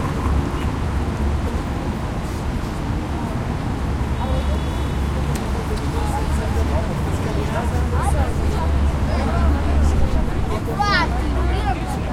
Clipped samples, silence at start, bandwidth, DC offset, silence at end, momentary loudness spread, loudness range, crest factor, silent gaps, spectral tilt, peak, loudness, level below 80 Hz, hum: under 0.1%; 0 s; 14 kHz; under 0.1%; 0 s; 6 LU; 4 LU; 16 dB; none; -6.5 dB/octave; -4 dBFS; -22 LUFS; -24 dBFS; none